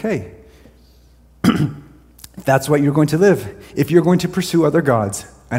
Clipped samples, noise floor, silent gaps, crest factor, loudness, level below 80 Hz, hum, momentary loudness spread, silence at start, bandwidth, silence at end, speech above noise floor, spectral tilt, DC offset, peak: under 0.1%; -49 dBFS; none; 18 dB; -17 LUFS; -46 dBFS; none; 12 LU; 0 s; 16.5 kHz; 0 s; 33 dB; -6.5 dB/octave; under 0.1%; 0 dBFS